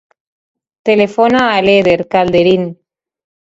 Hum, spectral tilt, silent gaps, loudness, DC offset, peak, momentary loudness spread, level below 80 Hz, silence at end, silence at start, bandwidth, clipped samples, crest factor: none; -6.5 dB/octave; none; -11 LUFS; under 0.1%; 0 dBFS; 6 LU; -48 dBFS; 0.85 s; 0.85 s; 7.8 kHz; under 0.1%; 14 dB